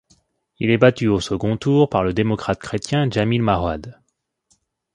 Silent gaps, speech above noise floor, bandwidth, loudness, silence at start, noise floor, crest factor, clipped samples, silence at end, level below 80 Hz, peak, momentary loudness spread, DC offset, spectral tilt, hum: none; 52 dB; 11.5 kHz; -19 LUFS; 0.6 s; -70 dBFS; 20 dB; under 0.1%; 1 s; -42 dBFS; 0 dBFS; 9 LU; under 0.1%; -6.5 dB/octave; none